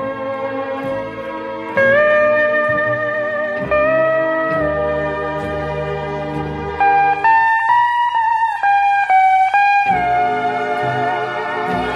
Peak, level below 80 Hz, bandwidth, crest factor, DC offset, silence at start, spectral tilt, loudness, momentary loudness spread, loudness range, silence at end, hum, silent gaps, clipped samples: -2 dBFS; -42 dBFS; 10.5 kHz; 14 dB; under 0.1%; 0 s; -6 dB/octave; -16 LUFS; 10 LU; 5 LU; 0 s; none; none; under 0.1%